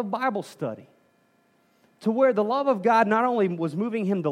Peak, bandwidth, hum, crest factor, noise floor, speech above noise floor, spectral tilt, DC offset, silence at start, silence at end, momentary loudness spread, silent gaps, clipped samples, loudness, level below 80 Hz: -6 dBFS; 12.5 kHz; none; 18 dB; -64 dBFS; 41 dB; -7.5 dB/octave; under 0.1%; 0 s; 0 s; 13 LU; none; under 0.1%; -24 LUFS; -84 dBFS